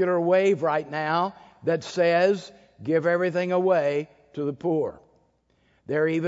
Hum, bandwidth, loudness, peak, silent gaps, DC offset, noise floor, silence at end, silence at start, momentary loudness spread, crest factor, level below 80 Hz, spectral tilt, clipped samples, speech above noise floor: none; 7.8 kHz; -24 LUFS; -10 dBFS; none; under 0.1%; -66 dBFS; 0 s; 0 s; 11 LU; 14 dB; -70 dBFS; -6.5 dB/octave; under 0.1%; 42 dB